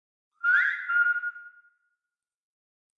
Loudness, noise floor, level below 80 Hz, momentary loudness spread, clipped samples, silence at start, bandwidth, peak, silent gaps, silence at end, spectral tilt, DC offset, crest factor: -24 LUFS; under -90 dBFS; under -90 dBFS; 8 LU; under 0.1%; 0.45 s; 6.6 kHz; -12 dBFS; none; 1.5 s; 3.5 dB/octave; under 0.1%; 18 dB